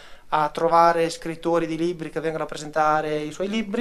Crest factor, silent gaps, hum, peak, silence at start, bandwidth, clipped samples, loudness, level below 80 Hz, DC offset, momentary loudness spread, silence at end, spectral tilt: 20 dB; none; none; -4 dBFS; 0 s; 13 kHz; under 0.1%; -23 LUFS; -54 dBFS; under 0.1%; 10 LU; 0 s; -5 dB/octave